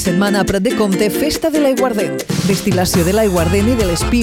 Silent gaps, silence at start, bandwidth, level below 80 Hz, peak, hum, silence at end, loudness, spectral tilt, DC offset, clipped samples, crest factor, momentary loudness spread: none; 0 s; 17 kHz; -30 dBFS; -4 dBFS; none; 0 s; -15 LUFS; -5 dB/octave; 0.2%; under 0.1%; 10 dB; 3 LU